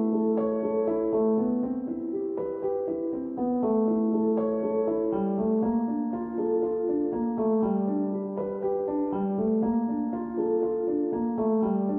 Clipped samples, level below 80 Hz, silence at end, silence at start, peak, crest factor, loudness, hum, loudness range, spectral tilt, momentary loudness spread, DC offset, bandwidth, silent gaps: under 0.1%; -60 dBFS; 0 s; 0 s; -16 dBFS; 12 dB; -27 LUFS; none; 1 LU; -13 dB/octave; 6 LU; under 0.1%; 2.7 kHz; none